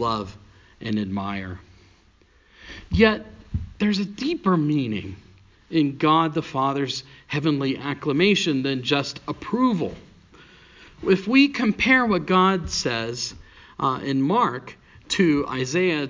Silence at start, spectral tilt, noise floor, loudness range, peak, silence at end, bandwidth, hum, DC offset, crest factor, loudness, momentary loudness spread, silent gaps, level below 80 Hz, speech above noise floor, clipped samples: 0 s; -5.5 dB/octave; -57 dBFS; 5 LU; -2 dBFS; 0 s; 7.6 kHz; none; under 0.1%; 22 dB; -22 LUFS; 14 LU; none; -44 dBFS; 35 dB; under 0.1%